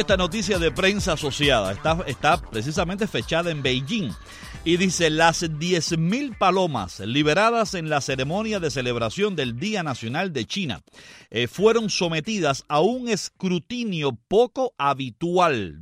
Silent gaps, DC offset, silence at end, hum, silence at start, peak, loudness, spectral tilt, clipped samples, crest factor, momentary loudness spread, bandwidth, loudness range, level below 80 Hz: none; under 0.1%; 0 s; none; 0 s; -4 dBFS; -23 LUFS; -4.5 dB/octave; under 0.1%; 18 dB; 7 LU; 15.5 kHz; 3 LU; -44 dBFS